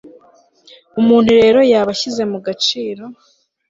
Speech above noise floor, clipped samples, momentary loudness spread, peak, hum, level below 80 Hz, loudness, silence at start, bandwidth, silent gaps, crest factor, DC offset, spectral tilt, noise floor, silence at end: 37 dB; under 0.1%; 16 LU; -2 dBFS; none; -52 dBFS; -13 LUFS; 0.05 s; 7.8 kHz; none; 14 dB; under 0.1%; -4.5 dB/octave; -50 dBFS; 0.55 s